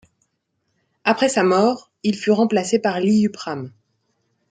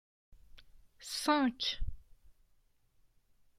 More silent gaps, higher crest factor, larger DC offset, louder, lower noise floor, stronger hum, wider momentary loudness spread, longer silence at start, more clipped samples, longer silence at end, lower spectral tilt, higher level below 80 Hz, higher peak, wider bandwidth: neither; about the same, 18 dB vs 22 dB; neither; first, -19 LUFS vs -34 LUFS; about the same, -72 dBFS vs -70 dBFS; neither; second, 13 LU vs 17 LU; first, 1.05 s vs 0.55 s; neither; second, 0.8 s vs 1.25 s; first, -5 dB/octave vs -3 dB/octave; second, -66 dBFS vs -50 dBFS; first, -2 dBFS vs -16 dBFS; second, 9.4 kHz vs 16 kHz